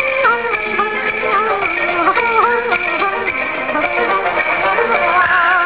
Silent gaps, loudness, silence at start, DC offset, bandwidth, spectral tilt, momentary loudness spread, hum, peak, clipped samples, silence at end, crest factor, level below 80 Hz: none; -14 LUFS; 0 s; 0.5%; 4 kHz; -7 dB/octave; 5 LU; none; -2 dBFS; under 0.1%; 0 s; 14 dB; -48 dBFS